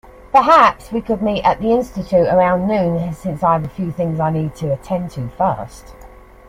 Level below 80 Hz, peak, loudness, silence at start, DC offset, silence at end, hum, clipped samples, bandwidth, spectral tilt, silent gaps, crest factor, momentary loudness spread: -42 dBFS; 0 dBFS; -17 LUFS; 0.05 s; under 0.1%; 0.4 s; none; under 0.1%; 15.5 kHz; -7.5 dB/octave; none; 16 dB; 13 LU